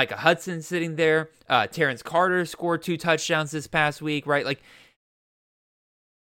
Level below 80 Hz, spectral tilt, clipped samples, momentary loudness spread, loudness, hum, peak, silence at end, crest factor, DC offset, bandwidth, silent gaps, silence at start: -64 dBFS; -4.5 dB/octave; under 0.1%; 6 LU; -24 LUFS; none; -4 dBFS; 1.7 s; 22 dB; under 0.1%; 17 kHz; none; 0 s